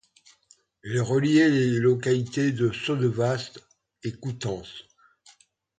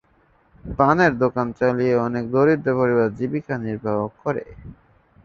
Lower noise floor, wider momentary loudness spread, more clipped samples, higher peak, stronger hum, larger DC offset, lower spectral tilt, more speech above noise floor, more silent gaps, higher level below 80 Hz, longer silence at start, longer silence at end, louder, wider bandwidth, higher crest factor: about the same, -62 dBFS vs -59 dBFS; first, 17 LU vs 10 LU; neither; second, -8 dBFS vs -2 dBFS; neither; neither; second, -6.5 dB/octave vs -8.5 dB/octave; about the same, 38 dB vs 39 dB; neither; second, -60 dBFS vs -48 dBFS; first, 0.85 s vs 0.65 s; first, 0.95 s vs 0.55 s; second, -24 LUFS vs -21 LUFS; first, 9.4 kHz vs 7 kHz; about the same, 18 dB vs 18 dB